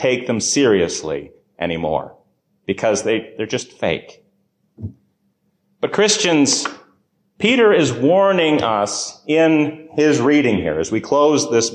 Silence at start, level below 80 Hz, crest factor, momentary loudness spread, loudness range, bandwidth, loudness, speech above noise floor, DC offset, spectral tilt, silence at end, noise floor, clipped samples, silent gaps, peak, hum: 0 s; -50 dBFS; 14 dB; 13 LU; 8 LU; 10 kHz; -17 LUFS; 49 dB; under 0.1%; -4 dB/octave; 0 s; -66 dBFS; under 0.1%; none; -4 dBFS; none